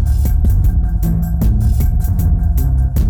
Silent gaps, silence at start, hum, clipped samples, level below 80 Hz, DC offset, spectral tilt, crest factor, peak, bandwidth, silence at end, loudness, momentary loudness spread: none; 0 s; none; under 0.1%; -14 dBFS; under 0.1%; -8.5 dB/octave; 8 dB; -6 dBFS; 19 kHz; 0 s; -16 LUFS; 2 LU